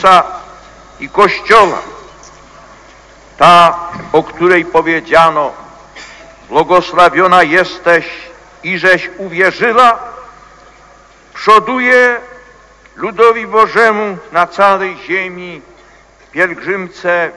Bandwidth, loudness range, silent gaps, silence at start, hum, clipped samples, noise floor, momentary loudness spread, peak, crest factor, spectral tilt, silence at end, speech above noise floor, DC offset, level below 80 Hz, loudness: 11 kHz; 3 LU; none; 0 s; none; 2%; -43 dBFS; 15 LU; 0 dBFS; 12 dB; -4.5 dB/octave; 0.05 s; 32 dB; under 0.1%; -46 dBFS; -10 LUFS